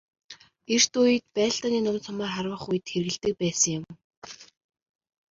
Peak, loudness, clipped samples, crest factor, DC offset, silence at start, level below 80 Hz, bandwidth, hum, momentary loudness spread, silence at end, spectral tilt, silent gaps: -8 dBFS; -25 LUFS; under 0.1%; 20 dB; under 0.1%; 0.3 s; -64 dBFS; 8 kHz; none; 23 LU; 0.85 s; -3 dB/octave; 4.04-4.10 s, 4.17-4.22 s